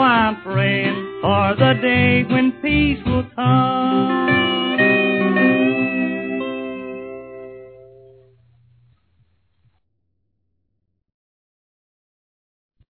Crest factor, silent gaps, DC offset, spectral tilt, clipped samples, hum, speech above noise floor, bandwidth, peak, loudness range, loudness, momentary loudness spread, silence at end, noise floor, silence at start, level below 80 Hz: 18 dB; none; under 0.1%; -10 dB/octave; under 0.1%; none; 56 dB; 4.5 kHz; -2 dBFS; 15 LU; -17 LUFS; 15 LU; 5.2 s; -72 dBFS; 0 s; -42 dBFS